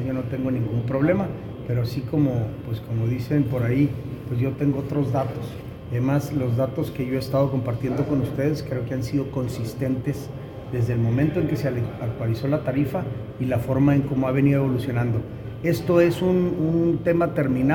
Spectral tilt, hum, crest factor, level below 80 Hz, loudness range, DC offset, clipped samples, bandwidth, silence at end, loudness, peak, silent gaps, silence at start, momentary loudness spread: -8.5 dB/octave; none; 16 dB; -46 dBFS; 4 LU; under 0.1%; under 0.1%; 18 kHz; 0 s; -24 LUFS; -6 dBFS; none; 0 s; 9 LU